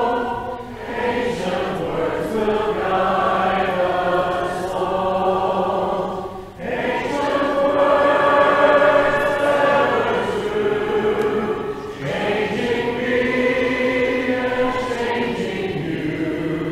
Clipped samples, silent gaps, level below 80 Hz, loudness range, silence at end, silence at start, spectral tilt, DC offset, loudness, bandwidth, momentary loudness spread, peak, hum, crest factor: under 0.1%; none; -44 dBFS; 5 LU; 0 s; 0 s; -5.5 dB/octave; under 0.1%; -19 LUFS; 14.5 kHz; 9 LU; -4 dBFS; none; 16 dB